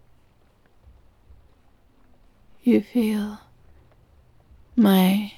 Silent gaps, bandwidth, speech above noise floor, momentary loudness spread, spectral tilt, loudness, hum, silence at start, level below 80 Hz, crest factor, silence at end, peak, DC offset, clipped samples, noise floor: none; 15.5 kHz; 39 dB; 13 LU; -7 dB/octave; -21 LUFS; none; 2.65 s; -58 dBFS; 20 dB; 0.1 s; -6 dBFS; under 0.1%; under 0.1%; -58 dBFS